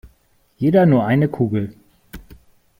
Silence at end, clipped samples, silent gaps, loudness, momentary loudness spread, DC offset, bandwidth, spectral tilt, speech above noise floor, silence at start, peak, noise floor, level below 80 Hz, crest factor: 0.6 s; under 0.1%; none; -17 LUFS; 10 LU; under 0.1%; 16.5 kHz; -9.5 dB/octave; 43 dB; 0.05 s; -2 dBFS; -59 dBFS; -48 dBFS; 18 dB